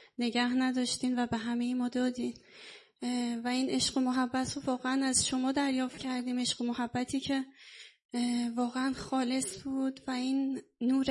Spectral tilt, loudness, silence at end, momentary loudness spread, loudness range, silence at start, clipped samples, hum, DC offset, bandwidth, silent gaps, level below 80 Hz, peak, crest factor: -3 dB/octave; -32 LUFS; 0 s; 9 LU; 3 LU; 0.2 s; under 0.1%; none; under 0.1%; 11.5 kHz; 8.05-8.09 s; -66 dBFS; -14 dBFS; 18 dB